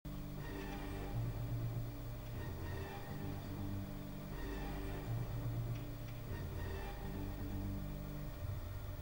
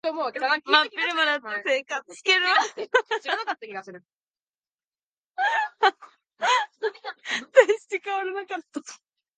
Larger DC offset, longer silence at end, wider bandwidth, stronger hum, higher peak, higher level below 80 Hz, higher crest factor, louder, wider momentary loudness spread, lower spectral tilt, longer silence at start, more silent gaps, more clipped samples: neither; second, 0 s vs 0.45 s; first, 19 kHz vs 9.6 kHz; neither; second, -30 dBFS vs -2 dBFS; first, -48 dBFS vs -86 dBFS; second, 14 dB vs 24 dB; second, -45 LUFS vs -24 LUFS; second, 5 LU vs 15 LU; first, -7 dB/octave vs -0.5 dB/octave; about the same, 0.05 s vs 0.05 s; second, none vs 4.15-4.19 s, 4.41-4.54 s, 4.74-4.78 s, 4.87-4.92 s, 5.03-5.24 s; neither